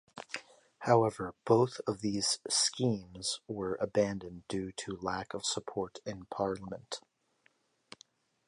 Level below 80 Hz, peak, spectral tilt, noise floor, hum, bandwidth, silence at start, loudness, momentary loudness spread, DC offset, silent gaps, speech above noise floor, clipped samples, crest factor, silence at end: -64 dBFS; -12 dBFS; -4 dB/octave; -72 dBFS; none; 11.5 kHz; 0.15 s; -33 LUFS; 15 LU; under 0.1%; none; 39 dB; under 0.1%; 22 dB; 1.5 s